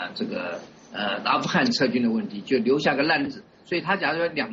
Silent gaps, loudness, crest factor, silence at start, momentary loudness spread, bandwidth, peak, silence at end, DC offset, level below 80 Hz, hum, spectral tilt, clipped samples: none; -24 LUFS; 18 dB; 0 s; 11 LU; 7.6 kHz; -8 dBFS; 0 s; under 0.1%; -66 dBFS; none; -3 dB/octave; under 0.1%